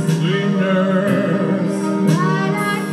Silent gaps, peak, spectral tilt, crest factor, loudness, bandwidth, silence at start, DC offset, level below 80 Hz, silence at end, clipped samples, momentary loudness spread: none; -4 dBFS; -6.5 dB/octave; 12 dB; -17 LUFS; 13 kHz; 0 s; under 0.1%; -68 dBFS; 0 s; under 0.1%; 3 LU